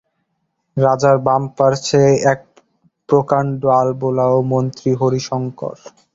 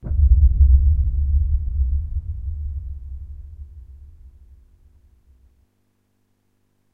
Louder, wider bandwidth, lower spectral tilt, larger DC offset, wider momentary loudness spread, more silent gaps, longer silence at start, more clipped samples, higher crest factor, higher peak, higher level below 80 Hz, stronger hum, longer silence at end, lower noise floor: first, -16 LUFS vs -20 LUFS; first, 7.8 kHz vs 0.7 kHz; second, -6.5 dB/octave vs -12 dB/octave; neither; second, 10 LU vs 24 LU; neither; first, 0.75 s vs 0.05 s; neither; about the same, 16 dB vs 18 dB; first, 0 dBFS vs -4 dBFS; second, -54 dBFS vs -20 dBFS; neither; second, 0.45 s vs 2.9 s; first, -70 dBFS vs -66 dBFS